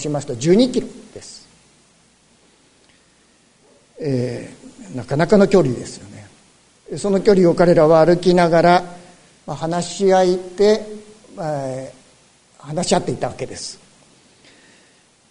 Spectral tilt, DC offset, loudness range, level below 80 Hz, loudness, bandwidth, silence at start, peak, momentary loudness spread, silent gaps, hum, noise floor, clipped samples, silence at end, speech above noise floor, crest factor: -6 dB/octave; under 0.1%; 13 LU; -46 dBFS; -17 LUFS; 11 kHz; 0 s; -2 dBFS; 23 LU; none; none; -55 dBFS; under 0.1%; 1.55 s; 39 dB; 18 dB